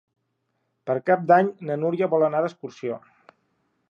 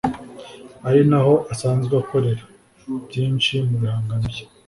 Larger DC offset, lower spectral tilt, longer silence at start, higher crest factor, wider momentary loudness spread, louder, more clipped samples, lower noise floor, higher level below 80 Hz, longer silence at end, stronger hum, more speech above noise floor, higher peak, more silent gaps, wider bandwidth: neither; about the same, -8 dB/octave vs -7 dB/octave; first, 0.85 s vs 0.05 s; about the same, 20 dB vs 16 dB; about the same, 15 LU vs 15 LU; second, -23 LUFS vs -20 LUFS; neither; first, -75 dBFS vs -40 dBFS; second, -80 dBFS vs -46 dBFS; first, 0.9 s vs 0.2 s; neither; first, 52 dB vs 21 dB; about the same, -4 dBFS vs -4 dBFS; neither; second, 7.2 kHz vs 11.5 kHz